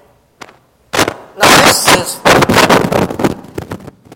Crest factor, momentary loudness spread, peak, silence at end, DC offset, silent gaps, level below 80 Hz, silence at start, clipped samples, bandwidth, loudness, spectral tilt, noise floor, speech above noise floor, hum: 12 dB; 20 LU; 0 dBFS; 0.4 s; under 0.1%; none; -38 dBFS; 0.95 s; 0.9%; over 20 kHz; -9 LUFS; -3 dB/octave; -44 dBFS; 34 dB; none